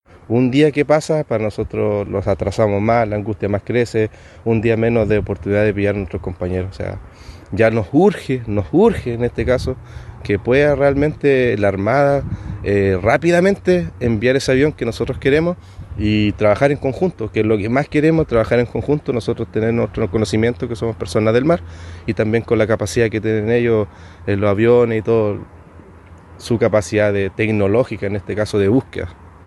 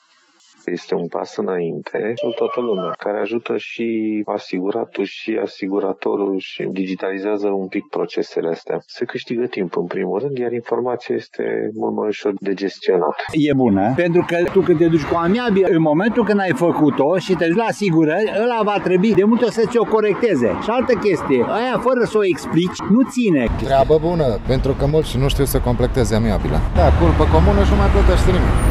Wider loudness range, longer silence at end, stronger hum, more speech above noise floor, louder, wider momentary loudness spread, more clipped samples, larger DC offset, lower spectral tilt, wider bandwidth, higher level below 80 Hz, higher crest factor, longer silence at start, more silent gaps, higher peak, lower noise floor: second, 3 LU vs 7 LU; first, 0.2 s vs 0 s; neither; second, 25 dB vs 37 dB; about the same, -17 LUFS vs -18 LUFS; about the same, 9 LU vs 9 LU; neither; neither; about the same, -7 dB/octave vs -7 dB/octave; second, 12 kHz vs 13.5 kHz; second, -38 dBFS vs -26 dBFS; about the same, 16 dB vs 16 dB; second, 0.3 s vs 0.65 s; neither; about the same, 0 dBFS vs 0 dBFS; second, -41 dBFS vs -54 dBFS